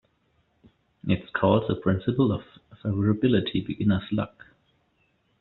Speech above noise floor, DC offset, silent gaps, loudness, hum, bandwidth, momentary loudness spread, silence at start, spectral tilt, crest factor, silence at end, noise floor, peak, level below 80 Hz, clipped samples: 45 dB; under 0.1%; none; -26 LUFS; none; 4.2 kHz; 10 LU; 1.05 s; -6.5 dB/octave; 20 dB; 1.1 s; -69 dBFS; -6 dBFS; -56 dBFS; under 0.1%